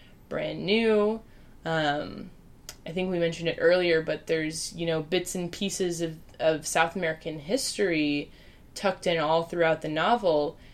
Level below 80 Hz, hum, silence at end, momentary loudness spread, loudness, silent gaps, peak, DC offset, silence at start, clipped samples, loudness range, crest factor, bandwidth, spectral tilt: -54 dBFS; none; 0 s; 13 LU; -27 LUFS; none; -8 dBFS; under 0.1%; 0.3 s; under 0.1%; 2 LU; 20 dB; 15.5 kHz; -4 dB/octave